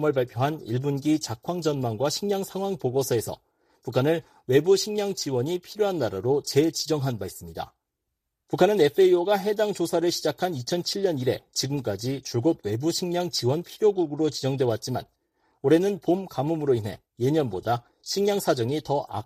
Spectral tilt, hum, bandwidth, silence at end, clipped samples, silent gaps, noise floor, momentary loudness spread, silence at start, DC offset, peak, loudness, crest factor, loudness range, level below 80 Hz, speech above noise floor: -5.5 dB/octave; none; 15.5 kHz; 0.05 s; under 0.1%; none; -82 dBFS; 9 LU; 0 s; under 0.1%; -6 dBFS; -25 LUFS; 18 dB; 3 LU; -62 dBFS; 57 dB